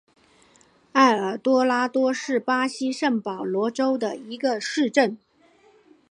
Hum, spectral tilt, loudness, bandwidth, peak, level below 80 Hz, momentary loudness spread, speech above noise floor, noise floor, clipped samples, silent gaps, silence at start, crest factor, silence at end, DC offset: none; -4 dB/octave; -23 LUFS; 10.5 kHz; -2 dBFS; -78 dBFS; 8 LU; 35 dB; -58 dBFS; under 0.1%; none; 0.95 s; 20 dB; 0.95 s; under 0.1%